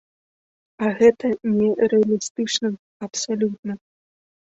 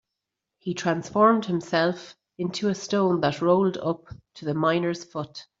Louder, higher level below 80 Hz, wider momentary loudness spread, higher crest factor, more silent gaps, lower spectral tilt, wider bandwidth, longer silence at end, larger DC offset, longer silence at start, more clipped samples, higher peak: first, -21 LUFS vs -25 LUFS; about the same, -62 dBFS vs -64 dBFS; about the same, 15 LU vs 15 LU; about the same, 20 dB vs 20 dB; first, 2.30-2.35 s, 2.79-3.00 s, 3.59-3.63 s vs none; second, -4.5 dB/octave vs -6 dB/octave; about the same, 8 kHz vs 7.8 kHz; first, 0.7 s vs 0.15 s; neither; first, 0.8 s vs 0.65 s; neither; first, -2 dBFS vs -6 dBFS